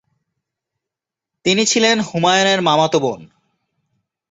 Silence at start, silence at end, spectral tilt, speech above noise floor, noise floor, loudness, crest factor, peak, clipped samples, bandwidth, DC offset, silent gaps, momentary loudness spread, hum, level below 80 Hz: 1.45 s; 1.05 s; -3 dB/octave; 70 dB; -85 dBFS; -15 LUFS; 18 dB; -2 dBFS; under 0.1%; 8.2 kHz; under 0.1%; none; 9 LU; none; -62 dBFS